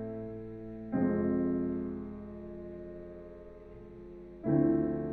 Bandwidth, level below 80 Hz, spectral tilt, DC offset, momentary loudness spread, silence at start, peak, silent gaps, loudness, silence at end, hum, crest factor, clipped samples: 2.9 kHz; -56 dBFS; -12.5 dB/octave; under 0.1%; 20 LU; 0 s; -16 dBFS; none; -34 LUFS; 0 s; none; 18 dB; under 0.1%